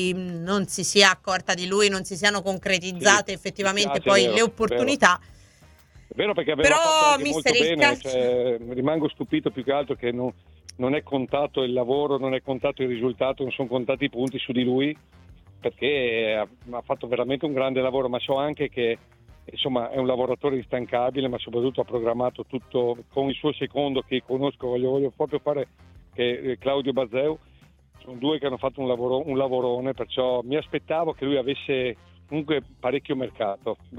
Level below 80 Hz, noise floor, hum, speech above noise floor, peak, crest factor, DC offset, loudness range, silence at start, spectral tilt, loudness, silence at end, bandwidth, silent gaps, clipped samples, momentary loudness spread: -56 dBFS; -54 dBFS; none; 30 dB; 0 dBFS; 24 dB; under 0.1%; 6 LU; 0 s; -3.5 dB/octave; -24 LUFS; 0 s; 17 kHz; none; under 0.1%; 10 LU